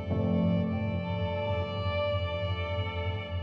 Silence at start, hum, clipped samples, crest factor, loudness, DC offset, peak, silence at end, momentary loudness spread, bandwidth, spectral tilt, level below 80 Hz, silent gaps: 0 s; none; under 0.1%; 12 dB; -31 LUFS; under 0.1%; -18 dBFS; 0 s; 5 LU; 5.6 kHz; -9 dB/octave; -46 dBFS; none